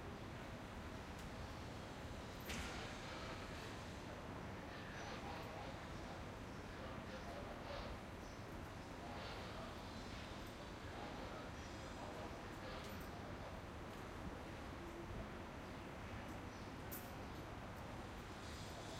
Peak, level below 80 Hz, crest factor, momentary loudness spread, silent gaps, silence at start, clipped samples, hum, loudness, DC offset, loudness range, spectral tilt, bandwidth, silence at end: -32 dBFS; -60 dBFS; 18 dB; 3 LU; none; 0 s; under 0.1%; none; -51 LUFS; under 0.1%; 1 LU; -5 dB/octave; 16 kHz; 0 s